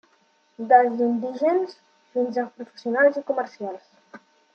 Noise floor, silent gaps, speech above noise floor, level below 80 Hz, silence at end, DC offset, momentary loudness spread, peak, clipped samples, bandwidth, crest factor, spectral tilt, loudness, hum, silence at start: -63 dBFS; none; 41 dB; -82 dBFS; 0.35 s; under 0.1%; 17 LU; -4 dBFS; under 0.1%; 6.8 kHz; 20 dB; -6.5 dB/octave; -23 LUFS; none; 0.6 s